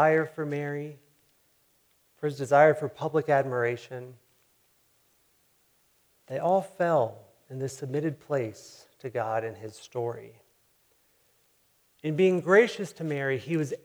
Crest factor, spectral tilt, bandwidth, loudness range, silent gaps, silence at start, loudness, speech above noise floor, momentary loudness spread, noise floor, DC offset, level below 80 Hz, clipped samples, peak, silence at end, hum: 22 dB; -6.5 dB/octave; over 20 kHz; 8 LU; none; 0 s; -28 LUFS; 41 dB; 18 LU; -68 dBFS; under 0.1%; -78 dBFS; under 0.1%; -8 dBFS; 0.1 s; none